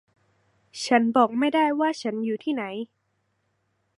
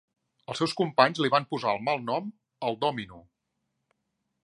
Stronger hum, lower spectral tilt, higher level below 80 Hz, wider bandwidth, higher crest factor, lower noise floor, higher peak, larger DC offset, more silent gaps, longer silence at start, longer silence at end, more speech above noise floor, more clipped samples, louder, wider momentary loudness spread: neither; about the same, -4.5 dB/octave vs -5 dB/octave; second, -78 dBFS vs -70 dBFS; about the same, 11.5 kHz vs 11.5 kHz; second, 20 dB vs 26 dB; second, -73 dBFS vs -80 dBFS; about the same, -6 dBFS vs -4 dBFS; neither; neither; first, 0.75 s vs 0.5 s; about the same, 1.15 s vs 1.25 s; about the same, 50 dB vs 53 dB; neither; first, -24 LUFS vs -27 LUFS; about the same, 15 LU vs 15 LU